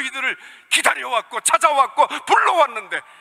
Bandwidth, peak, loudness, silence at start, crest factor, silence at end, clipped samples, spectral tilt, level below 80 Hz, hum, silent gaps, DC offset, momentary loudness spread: 16 kHz; -2 dBFS; -18 LUFS; 0 s; 18 dB; 0.2 s; under 0.1%; 1 dB/octave; -72 dBFS; none; none; under 0.1%; 9 LU